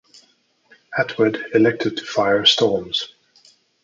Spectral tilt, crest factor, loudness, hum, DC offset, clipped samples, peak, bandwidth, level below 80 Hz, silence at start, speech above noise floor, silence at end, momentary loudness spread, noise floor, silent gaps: -4 dB/octave; 20 dB; -18 LUFS; none; under 0.1%; under 0.1%; -2 dBFS; 7.6 kHz; -60 dBFS; 0.9 s; 42 dB; 0.75 s; 10 LU; -60 dBFS; none